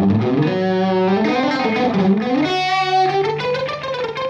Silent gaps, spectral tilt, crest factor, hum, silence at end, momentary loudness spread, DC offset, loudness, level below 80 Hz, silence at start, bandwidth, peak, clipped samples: none; -6.5 dB/octave; 12 dB; none; 0 s; 5 LU; under 0.1%; -18 LUFS; -54 dBFS; 0 s; 7.6 kHz; -6 dBFS; under 0.1%